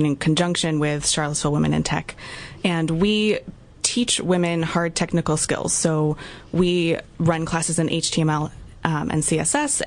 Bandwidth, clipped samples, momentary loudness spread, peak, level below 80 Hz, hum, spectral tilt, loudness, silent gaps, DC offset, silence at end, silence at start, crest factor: 11 kHz; under 0.1%; 6 LU; -2 dBFS; -46 dBFS; none; -4 dB/octave; -21 LUFS; none; under 0.1%; 0 s; 0 s; 20 dB